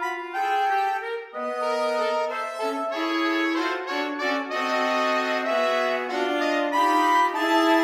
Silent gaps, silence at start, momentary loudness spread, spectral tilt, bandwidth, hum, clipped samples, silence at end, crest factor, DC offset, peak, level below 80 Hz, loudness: none; 0 s; 8 LU; -1.5 dB/octave; 16.5 kHz; none; under 0.1%; 0 s; 16 dB; under 0.1%; -8 dBFS; -78 dBFS; -24 LUFS